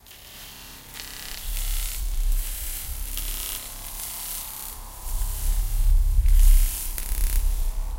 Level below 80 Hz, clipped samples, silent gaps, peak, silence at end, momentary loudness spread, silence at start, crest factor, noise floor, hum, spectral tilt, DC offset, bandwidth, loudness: -24 dBFS; under 0.1%; none; -6 dBFS; 0 s; 14 LU; 0.1 s; 16 dB; -43 dBFS; none; -2.5 dB/octave; under 0.1%; 17 kHz; -28 LUFS